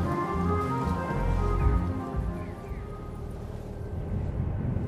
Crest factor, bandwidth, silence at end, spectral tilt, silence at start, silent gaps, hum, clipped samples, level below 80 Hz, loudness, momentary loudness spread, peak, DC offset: 18 dB; 13 kHz; 0 s; -8.5 dB/octave; 0 s; none; none; under 0.1%; -34 dBFS; -31 LUFS; 12 LU; -12 dBFS; under 0.1%